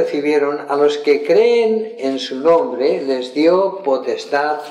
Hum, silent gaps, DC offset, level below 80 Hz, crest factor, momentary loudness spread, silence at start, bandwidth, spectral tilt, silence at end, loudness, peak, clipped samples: none; none; under 0.1%; -68 dBFS; 14 dB; 7 LU; 0 s; 11 kHz; -5 dB/octave; 0 s; -16 LUFS; -2 dBFS; under 0.1%